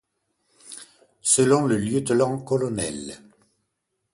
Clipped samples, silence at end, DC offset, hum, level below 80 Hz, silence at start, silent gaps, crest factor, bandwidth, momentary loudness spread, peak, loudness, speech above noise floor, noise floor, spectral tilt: under 0.1%; 0.95 s; under 0.1%; none; -58 dBFS; 0.65 s; none; 20 dB; 11.5 kHz; 23 LU; -4 dBFS; -22 LUFS; 55 dB; -77 dBFS; -4.5 dB/octave